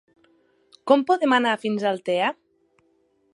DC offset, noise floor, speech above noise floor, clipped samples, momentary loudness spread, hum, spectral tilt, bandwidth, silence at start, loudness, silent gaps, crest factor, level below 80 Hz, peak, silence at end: under 0.1%; -65 dBFS; 44 dB; under 0.1%; 10 LU; none; -5 dB/octave; 11.5 kHz; 0.85 s; -22 LUFS; none; 22 dB; -78 dBFS; -2 dBFS; 1 s